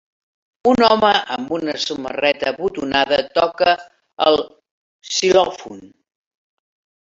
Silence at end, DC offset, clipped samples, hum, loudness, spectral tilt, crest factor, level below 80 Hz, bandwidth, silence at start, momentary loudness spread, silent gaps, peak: 1.15 s; under 0.1%; under 0.1%; none; -17 LUFS; -3 dB/octave; 18 dB; -54 dBFS; 7.8 kHz; 0.65 s; 9 LU; 4.71-5.00 s; -2 dBFS